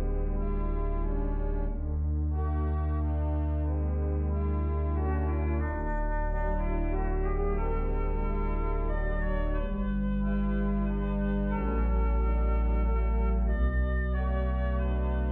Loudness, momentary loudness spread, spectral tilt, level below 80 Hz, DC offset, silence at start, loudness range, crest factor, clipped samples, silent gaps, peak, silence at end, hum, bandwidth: -31 LUFS; 4 LU; -11.5 dB/octave; -30 dBFS; under 0.1%; 0 s; 3 LU; 10 dB; under 0.1%; none; -18 dBFS; 0 s; none; 3.8 kHz